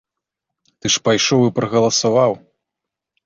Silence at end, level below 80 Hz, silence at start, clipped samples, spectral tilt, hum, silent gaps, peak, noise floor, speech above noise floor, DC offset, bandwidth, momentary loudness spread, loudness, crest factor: 0.9 s; -56 dBFS; 0.85 s; under 0.1%; -4 dB/octave; none; none; -4 dBFS; -83 dBFS; 67 dB; under 0.1%; 7.8 kHz; 6 LU; -16 LUFS; 16 dB